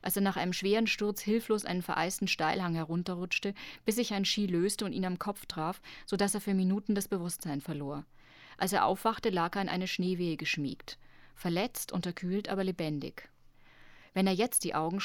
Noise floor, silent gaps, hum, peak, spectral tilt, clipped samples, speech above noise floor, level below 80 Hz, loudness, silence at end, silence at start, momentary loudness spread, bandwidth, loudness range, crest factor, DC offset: -58 dBFS; none; none; -14 dBFS; -4.5 dB/octave; under 0.1%; 25 dB; -62 dBFS; -32 LUFS; 0 s; 0.05 s; 9 LU; 19 kHz; 3 LU; 18 dB; under 0.1%